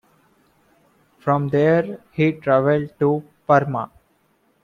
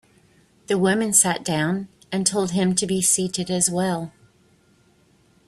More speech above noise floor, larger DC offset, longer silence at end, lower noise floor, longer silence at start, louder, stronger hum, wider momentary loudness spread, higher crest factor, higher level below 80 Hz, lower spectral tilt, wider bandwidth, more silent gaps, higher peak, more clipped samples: first, 44 dB vs 37 dB; neither; second, 0.75 s vs 1.4 s; first, -63 dBFS vs -59 dBFS; first, 1.25 s vs 0.7 s; about the same, -20 LUFS vs -21 LUFS; neither; about the same, 11 LU vs 11 LU; about the same, 18 dB vs 20 dB; about the same, -60 dBFS vs -60 dBFS; first, -9 dB/octave vs -3.5 dB/octave; second, 6.8 kHz vs 14 kHz; neither; about the same, -2 dBFS vs -4 dBFS; neither